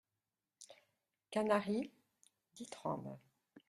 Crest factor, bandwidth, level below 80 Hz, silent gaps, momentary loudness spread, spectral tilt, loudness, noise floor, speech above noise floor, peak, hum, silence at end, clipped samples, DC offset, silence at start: 24 dB; 12.5 kHz; -82 dBFS; none; 24 LU; -5.5 dB/octave; -40 LUFS; under -90 dBFS; over 51 dB; -20 dBFS; none; 0.1 s; under 0.1%; under 0.1%; 0.6 s